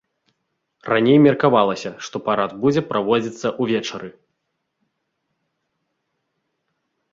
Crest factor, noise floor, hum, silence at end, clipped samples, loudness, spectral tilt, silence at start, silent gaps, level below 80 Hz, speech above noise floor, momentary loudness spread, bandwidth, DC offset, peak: 20 dB; -75 dBFS; none; 3 s; under 0.1%; -19 LUFS; -6 dB/octave; 0.85 s; none; -62 dBFS; 57 dB; 16 LU; 7.6 kHz; under 0.1%; -2 dBFS